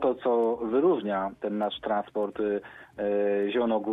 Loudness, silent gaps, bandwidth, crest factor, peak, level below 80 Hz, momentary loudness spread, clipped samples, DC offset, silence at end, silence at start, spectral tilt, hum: -28 LUFS; none; 4 kHz; 14 dB; -14 dBFS; -64 dBFS; 7 LU; under 0.1%; under 0.1%; 0 s; 0 s; -8 dB/octave; none